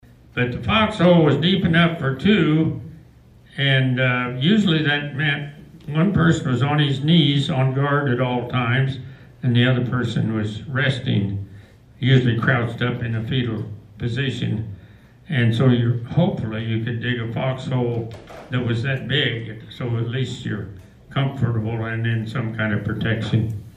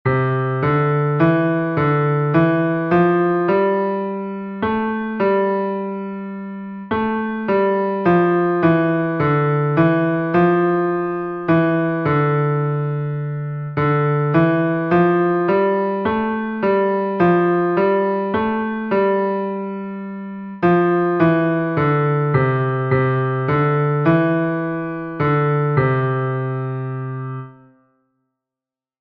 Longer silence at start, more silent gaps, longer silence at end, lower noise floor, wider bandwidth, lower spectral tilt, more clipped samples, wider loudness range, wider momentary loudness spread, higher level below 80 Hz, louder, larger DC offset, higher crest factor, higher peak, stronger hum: first, 0.35 s vs 0.05 s; neither; second, 0.05 s vs 1.5 s; second, -48 dBFS vs -89 dBFS; first, 9.6 kHz vs 5 kHz; second, -7 dB/octave vs -11 dB/octave; neither; about the same, 6 LU vs 4 LU; first, 12 LU vs 9 LU; about the same, -48 dBFS vs -52 dBFS; second, -21 LUFS vs -18 LUFS; neither; about the same, 16 dB vs 14 dB; about the same, -4 dBFS vs -4 dBFS; neither